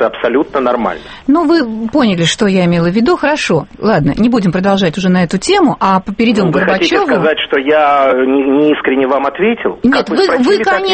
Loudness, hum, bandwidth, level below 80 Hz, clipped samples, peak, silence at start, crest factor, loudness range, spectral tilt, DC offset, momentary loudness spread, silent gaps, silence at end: -11 LUFS; none; 8.8 kHz; -40 dBFS; under 0.1%; 0 dBFS; 0 s; 12 dB; 1 LU; -5.5 dB/octave; under 0.1%; 4 LU; none; 0 s